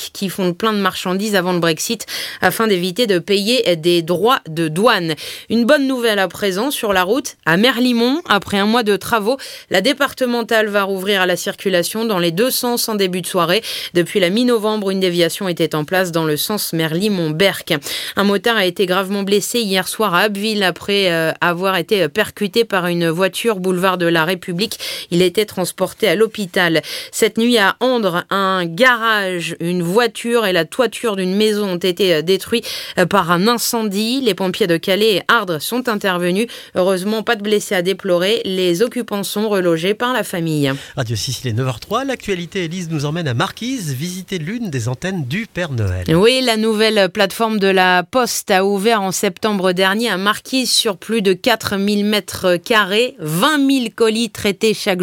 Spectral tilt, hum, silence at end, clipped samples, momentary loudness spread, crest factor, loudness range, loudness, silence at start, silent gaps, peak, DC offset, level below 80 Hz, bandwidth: -4 dB/octave; none; 0 s; under 0.1%; 7 LU; 16 dB; 3 LU; -16 LUFS; 0 s; none; 0 dBFS; under 0.1%; -54 dBFS; 17 kHz